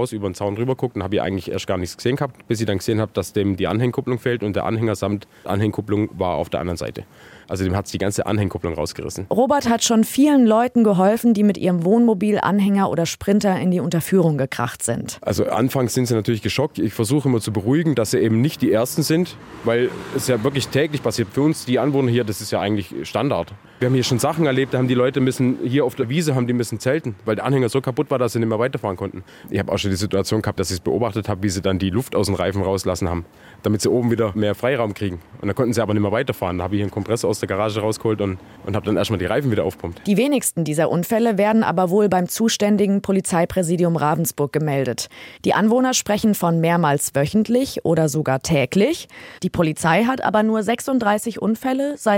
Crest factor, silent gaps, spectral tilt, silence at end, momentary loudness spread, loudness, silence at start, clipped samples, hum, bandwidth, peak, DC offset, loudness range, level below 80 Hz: 16 dB; none; -5.5 dB/octave; 0 s; 8 LU; -20 LUFS; 0 s; under 0.1%; none; 17 kHz; -4 dBFS; under 0.1%; 5 LU; -52 dBFS